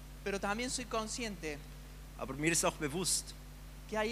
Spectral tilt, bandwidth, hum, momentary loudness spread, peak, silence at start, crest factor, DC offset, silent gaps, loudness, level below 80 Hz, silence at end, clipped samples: -3 dB/octave; 15.5 kHz; none; 20 LU; -18 dBFS; 0 s; 20 dB; under 0.1%; none; -36 LUFS; -50 dBFS; 0 s; under 0.1%